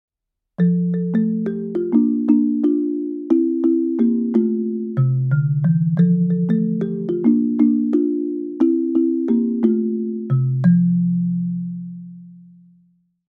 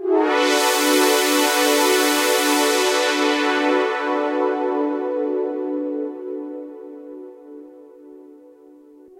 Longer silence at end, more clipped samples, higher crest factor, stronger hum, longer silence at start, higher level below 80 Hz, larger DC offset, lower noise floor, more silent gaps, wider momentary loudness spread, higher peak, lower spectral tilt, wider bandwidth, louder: about the same, 0.9 s vs 0.85 s; neither; about the same, 16 dB vs 20 dB; neither; first, 0.6 s vs 0 s; first, -66 dBFS vs -80 dBFS; neither; first, -80 dBFS vs -47 dBFS; neither; second, 7 LU vs 18 LU; about the same, -4 dBFS vs -2 dBFS; first, -12.5 dB/octave vs 0.5 dB/octave; second, 3.7 kHz vs 16 kHz; about the same, -19 LUFS vs -18 LUFS